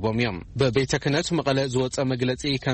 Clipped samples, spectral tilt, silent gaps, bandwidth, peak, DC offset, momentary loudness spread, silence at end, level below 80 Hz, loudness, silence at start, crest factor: under 0.1%; -5 dB/octave; none; 8.8 kHz; -6 dBFS; under 0.1%; 3 LU; 0 s; -46 dBFS; -24 LUFS; 0 s; 18 dB